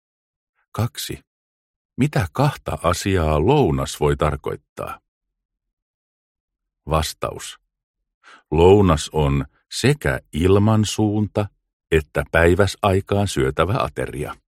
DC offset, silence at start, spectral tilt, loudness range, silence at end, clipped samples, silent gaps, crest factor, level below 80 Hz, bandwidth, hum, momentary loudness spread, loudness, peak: under 0.1%; 0.75 s; -6 dB/octave; 11 LU; 0.2 s; under 0.1%; 1.27-1.89 s, 4.69-4.76 s, 5.08-5.21 s, 5.45-5.49 s, 5.73-6.48 s, 7.83-7.94 s, 8.14-8.21 s, 11.73-11.80 s; 20 dB; -36 dBFS; 15.5 kHz; none; 15 LU; -20 LUFS; -2 dBFS